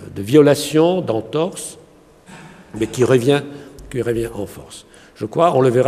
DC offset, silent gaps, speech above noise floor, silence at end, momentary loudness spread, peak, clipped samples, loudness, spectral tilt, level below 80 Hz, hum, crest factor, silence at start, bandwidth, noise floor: under 0.1%; none; 30 dB; 0 s; 22 LU; 0 dBFS; under 0.1%; -17 LUFS; -6 dB/octave; -48 dBFS; none; 18 dB; 0 s; 15 kHz; -46 dBFS